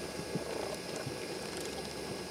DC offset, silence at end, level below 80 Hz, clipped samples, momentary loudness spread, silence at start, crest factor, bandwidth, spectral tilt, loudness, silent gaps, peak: under 0.1%; 0 s; -60 dBFS; under 0.1%; 2 LU; 0 s; 16 dB; 17.5 kHz; -4 dB/octave; -39 LUFS; none; -24 dBFS